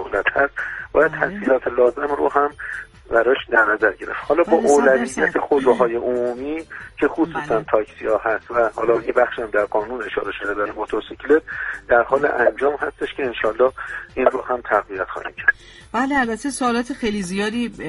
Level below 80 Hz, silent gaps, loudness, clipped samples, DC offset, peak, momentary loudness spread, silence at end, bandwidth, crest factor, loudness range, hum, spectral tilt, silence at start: -48 dBFS; none; -20 LUFS; under 0.1%; under 0.1%; 0 dBFS; 10 LU; 0 s; 11.5 kHz; 20 dB; 4 LU; none; -4.5 dB/octave; 0 s